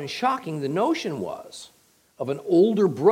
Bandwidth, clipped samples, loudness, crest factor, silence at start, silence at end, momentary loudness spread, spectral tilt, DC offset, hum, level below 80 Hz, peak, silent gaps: 15.5 kHz; under 0.1%; -24 LUFS; 18 dB; 0 s; 0 s; 17 LU; -6.5 dB/octave; under 0.1%; none; -72 dBFS; -6 dBFS; none